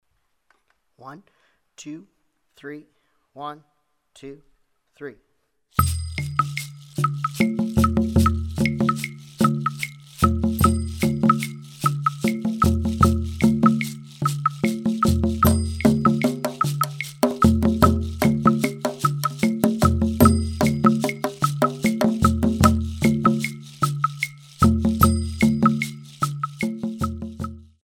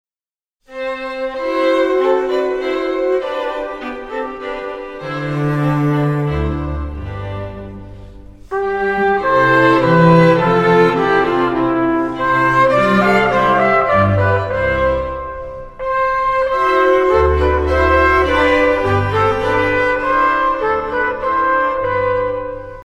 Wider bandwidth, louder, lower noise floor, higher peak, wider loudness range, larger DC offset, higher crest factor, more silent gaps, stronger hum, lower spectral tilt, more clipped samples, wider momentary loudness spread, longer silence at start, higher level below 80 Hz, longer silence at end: first, 18.5 kHz vs 12 kHz; second, -21 LUFS vs -15 LUFS; second, -67 dBFS vs under -90 dBFS; about the same, 0 dBFS vs 0 dBFS; first, 11 LU vs 7 LU; neither; first, 22 dB vs 14 dB; neither; neither; about the same, -6.5 dB/octave vs -7.5 dB/octave; neither; about the same, 15 LU vs 13 LU; first, 1 s vs 0.7 s; about the same, -34 dBFS vs -32 dBFS; first, 0.25 s vs 0.05 s